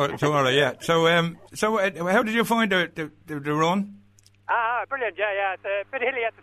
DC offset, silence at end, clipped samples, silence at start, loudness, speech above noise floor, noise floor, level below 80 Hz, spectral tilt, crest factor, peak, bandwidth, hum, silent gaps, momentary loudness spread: under 0.1%; 0.1 s; under 0.1%; 0 s; -23 LUFS; 32 dB; -56 dBFS; -62 dBFS; -5 dB/octave; 18 dB; -6 dBFS; 13.5 kHz; none; none; 9 LU